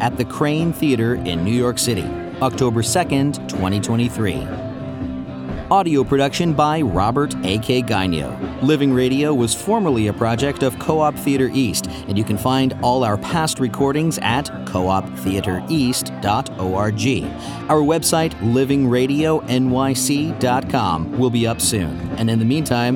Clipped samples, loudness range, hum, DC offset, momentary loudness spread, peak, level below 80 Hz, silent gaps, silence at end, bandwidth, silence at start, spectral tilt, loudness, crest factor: under 0.1%; 3 LU; none; under 0.1%; 6 LU; -2 dBFS; -40 dBFS; none; 0 s; 18 kHz; 0 s; -5 dB/octave; -19 LUFS; 16 dB